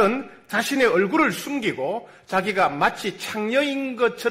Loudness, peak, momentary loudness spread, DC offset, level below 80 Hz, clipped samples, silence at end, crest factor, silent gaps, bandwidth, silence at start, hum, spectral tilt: -23 LUFS; -6 dBFS; 9 LU; under 0.1%; -60 dBFS; under 0.1%; 0 s; 16 dB; none; 16 kHz; 0 s; none; -4 dB/octave